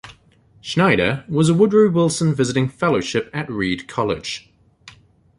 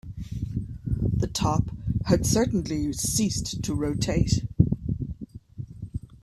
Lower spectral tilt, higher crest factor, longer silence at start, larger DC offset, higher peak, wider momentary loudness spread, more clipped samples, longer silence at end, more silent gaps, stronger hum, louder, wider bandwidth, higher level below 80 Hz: about the same, -5.5 dB/octave vs -5.5 dB/octave; about the same, 18 dB vs 20 dB; about the same, 0.05 s vs 0.05 s; neither; first, -2 dBFS vs -6 dBFS; about the same, 12 LU vs 14 LU; neither; first, 0.5 s vs 0.1 s; neither; neither; first, -19 LUFS vs -26 LUFS; second, 11.5 kHz vs 15.5 kHz; second, -50 dBFS vs -38 dBFS